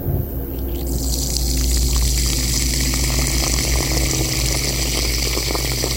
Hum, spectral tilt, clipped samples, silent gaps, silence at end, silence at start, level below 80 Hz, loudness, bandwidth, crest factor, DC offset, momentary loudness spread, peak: none; -3 dB/octave; under 0.1%; none; 0 s; 0 s; -22 dBFS; -19 LUFS; 17 kHz; 18 dB; under 0.1%; 6 LU; 0 dBFS